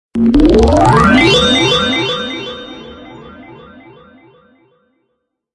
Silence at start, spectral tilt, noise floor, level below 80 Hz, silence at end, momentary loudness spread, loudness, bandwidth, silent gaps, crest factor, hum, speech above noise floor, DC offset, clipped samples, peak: 0.15 s; -5 dB/octave; -69 dBFS; -26 dBFS; 2 s; 20 LU; -10 LUFS; 11.5 kHz; none; 14 dB; none; 61 dB; under 0.1%; under 0.1%; 0 dBFS